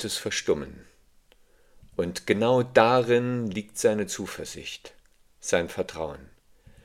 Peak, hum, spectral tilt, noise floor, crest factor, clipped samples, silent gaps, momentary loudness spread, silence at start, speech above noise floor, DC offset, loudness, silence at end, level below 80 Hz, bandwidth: -2 dBFS; none; -4.5 dB/octave; -59 dBFS; 24 dB; under 0.1%; none; 17 LU; 0 s; 33 dB; under 0.1%; -26 LUFS; 0.6 s; -58 dBFS; 16 kHz